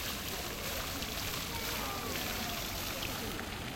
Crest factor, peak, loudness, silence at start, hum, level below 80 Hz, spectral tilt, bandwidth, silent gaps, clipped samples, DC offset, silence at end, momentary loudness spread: 18 dB; -20 dBFS; -36 LUFS; 0 s; none; -50 dBFS; -2.5 dB/octave; 17 kHz; none; under 0.1%; under 0.1%; 0 s; 2 LU